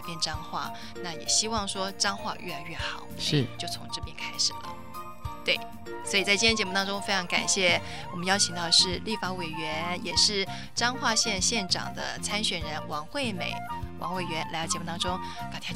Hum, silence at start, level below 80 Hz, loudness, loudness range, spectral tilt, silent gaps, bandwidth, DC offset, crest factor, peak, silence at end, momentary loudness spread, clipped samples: none; 0 s; -50 dBFS; -27 LUFS; 6 LU; -2 dB/octave; none; 16 kHz; 0.8%; 22 dB; -8 dBFS; 0 s; 14 LU; under 0.1%